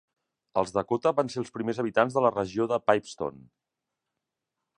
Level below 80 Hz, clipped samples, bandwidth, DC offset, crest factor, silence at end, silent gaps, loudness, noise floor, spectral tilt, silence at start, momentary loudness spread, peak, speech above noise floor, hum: -64 dBFS; under 0.1%; 10.5 kHz; under 0.1%; 24 dB; 1.5 s; none; -27 LUFS; -86 dBFS; -6 dB/octave; 0.55 s; 8 LU; -4 dBFS; 59 dB; none